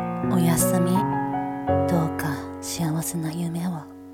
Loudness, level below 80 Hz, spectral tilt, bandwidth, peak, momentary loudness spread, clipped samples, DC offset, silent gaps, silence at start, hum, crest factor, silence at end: -24 LUFS; -52 dBFS; -6 dB/octave; 17 kHz; -8 dBFS; 10 LU; under 0.1%; under 0.1%; none; 0 s; none; 16 dB; 0 s